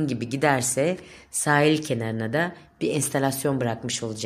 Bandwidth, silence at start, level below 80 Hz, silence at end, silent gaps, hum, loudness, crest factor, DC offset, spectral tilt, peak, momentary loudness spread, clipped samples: 16 kHz; 0 s; -62 dBFS; 0 s; none; none; -24 LUFS; 20 dB; under 0.1%; -4.5 dB/octave; -4 dBFS; 9 LU; under 0.1%